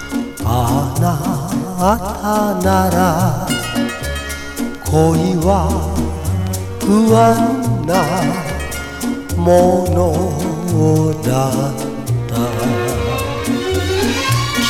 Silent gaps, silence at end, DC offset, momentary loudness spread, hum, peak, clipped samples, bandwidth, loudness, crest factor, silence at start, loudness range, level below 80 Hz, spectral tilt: none; 0 s; under 0.1%; 9 LU; none; 0 dBFS; under 0.1%; 18.5 kHz; -16 LUFS; 16 dB; 0 s; 3 LU; -30 dBFS; -5.5 dB/octave